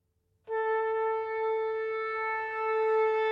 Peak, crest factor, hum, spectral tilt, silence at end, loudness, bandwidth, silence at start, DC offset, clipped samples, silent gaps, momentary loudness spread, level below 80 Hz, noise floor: -18 dBFS; 12 dB; none; -4 dB/octave; 0 s; -30 LUFS; 5.2 kHz; 0.45 s; under 0.1%; under 0.1%; none; 6 LU; -78 dBFS; -55 dBFS